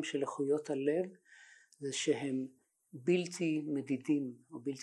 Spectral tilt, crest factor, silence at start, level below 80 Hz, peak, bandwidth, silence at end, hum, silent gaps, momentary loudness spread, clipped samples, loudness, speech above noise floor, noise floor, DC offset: -5 dB/octave; 18 dB; 0 s; -88 dBFS; -18 dBFS; 12 kHz; 0 s; none; none; 10 LU; under 0.1%; -36 LUFS; 25 dB; -61 dBFS; under 0.1%